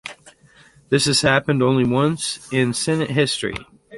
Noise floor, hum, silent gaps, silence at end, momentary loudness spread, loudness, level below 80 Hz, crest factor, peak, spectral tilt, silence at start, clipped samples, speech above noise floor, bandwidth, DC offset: -51 dBFS; none; none; 0 s; 9 LU; -19 LUFS; -50 dBFS; 18 dB; -2 dBFS; -4.5 dB/octave; 0.05 s; under 0.1%; 32 dB; 11.5 kHz; under 0.1%